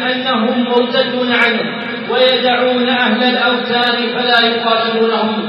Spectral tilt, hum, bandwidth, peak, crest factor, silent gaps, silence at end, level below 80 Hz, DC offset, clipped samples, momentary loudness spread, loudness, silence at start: -6 dB/octave; none; 6.6 kHz; 0 dBFS; 14 dB; none; 0 s; -72 dBFS; under 0.1%; under 0.1%; 4 LU; -13 LUFS; 0 s